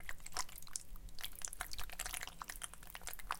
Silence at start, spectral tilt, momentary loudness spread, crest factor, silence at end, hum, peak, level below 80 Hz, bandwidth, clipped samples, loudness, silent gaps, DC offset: 0 s; -0.5 dB/octave; 5 LU; 26 dB; 0 s; none; -18 dBFS; -54 dBFS; 17 kHz; under 0.1%; -46 LUFS; none; under 0.1%